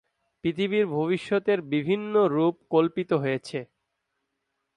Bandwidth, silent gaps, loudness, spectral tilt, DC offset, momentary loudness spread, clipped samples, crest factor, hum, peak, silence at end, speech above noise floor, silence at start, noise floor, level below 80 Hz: 10.5 kHz; none; -25 LUFS; -7.5 dB/octave; under 0.1%; 8 LU; under 0.1%; 16 dB; none; -10 dBFS; 1.15 s; 55 dB; 0.45 s; -80 dBFS; -68 dBFS